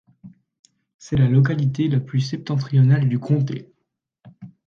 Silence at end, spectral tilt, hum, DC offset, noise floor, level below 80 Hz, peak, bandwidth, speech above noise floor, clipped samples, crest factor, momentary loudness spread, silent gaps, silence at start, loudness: 0.2 s; -8 dB/octave; none; under 0.1%; -76 dBFS; -52 dBFS; -6 dBFS; 7 kHz; 57 dB; under 0.1%; 16 dB; 9 LU; 0.59-0.64 s, 0.94-0.99 s; 0.25 s; -20 LUFS